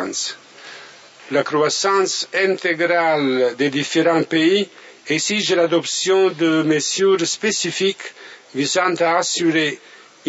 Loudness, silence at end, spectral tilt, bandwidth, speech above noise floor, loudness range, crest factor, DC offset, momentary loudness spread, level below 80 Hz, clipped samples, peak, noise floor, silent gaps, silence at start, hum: -18 LUFS; 0 s; -3 dB/octave; 8 kHz; 24 dB; 2 LU; 16 dB; under 0.1%; 13 LU; -72 dBFS; under 0.1%; -2 dBFS; -42 dBFS; none; 0 s; none